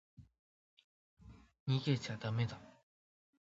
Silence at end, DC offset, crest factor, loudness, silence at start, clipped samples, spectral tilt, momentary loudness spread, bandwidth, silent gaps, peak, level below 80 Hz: 0.8 s; under 0.1%; 20 dB; -38 LUFS; 0.2 s; under 0.1%; -6 dB/octave; 11 LU; 7.6 kHz; 0.39-0.77 s, 0.84-1.17 s, 1.60-1.66 s; -22 dBFS; -70 dBFS